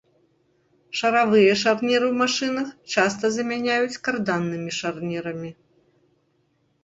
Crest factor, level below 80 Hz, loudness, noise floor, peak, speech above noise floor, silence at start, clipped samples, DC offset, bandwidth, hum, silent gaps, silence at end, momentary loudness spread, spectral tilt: 20 dB; -66 dBFS; -22 LUFS; -67 dBFS; -4 dBFS; 45 dB; 0.9 s; under 0.1%; under 0.1%; 8 kHz; none; none; 1.3 s; 12 LU; -4 dB/octave